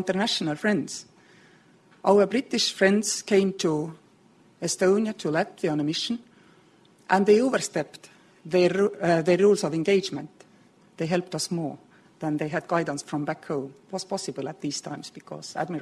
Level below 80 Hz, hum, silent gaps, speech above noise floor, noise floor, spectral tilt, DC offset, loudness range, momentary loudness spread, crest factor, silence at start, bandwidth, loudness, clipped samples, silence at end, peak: -70 dBFS; none; none; 33 dB; -58 dBFS; -4.5 dB/octave; under 0.1%; 7 LU; 15 LU; 20 dB; 0 s; 12.5 kHz; -25 LUFS; under 0.1%; 0 s; -6 dBFS